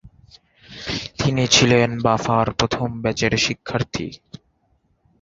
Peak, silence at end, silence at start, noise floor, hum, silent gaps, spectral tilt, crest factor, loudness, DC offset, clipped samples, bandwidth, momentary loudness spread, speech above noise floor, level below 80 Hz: -2 dBFS; 1.05 s; 0.05 s; -64 dBFS; none; none; -4 dB/octave; 20 dB; -19 LUFS; under 0.1%; under 0.1%; 7.8 kHz; 14 LU; 45 dB; -44 dBFS